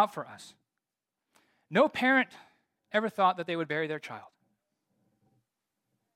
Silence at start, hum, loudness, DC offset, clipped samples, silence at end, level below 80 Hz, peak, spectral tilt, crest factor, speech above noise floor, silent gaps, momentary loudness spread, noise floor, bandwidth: 0 s; none; -29 LUFS; under 0.1%; under 0.1%; 1.95 s; -82 dBFS; -12 dBFS; -5.5 dB/octave; 20 dB; 59 dB; none; 19 LU; -89 dBFS; 15.5 kHz